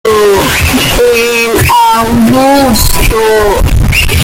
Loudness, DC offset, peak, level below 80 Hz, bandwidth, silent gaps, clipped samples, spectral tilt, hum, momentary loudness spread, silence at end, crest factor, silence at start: -7 LUFS; under 0.1%; 0 dBFS; -16 dBFS; 17.5 kHz; none; under 0.1%; -4 dB/octave; none; 2 LU; 0 s; 6 dB; 0.05 s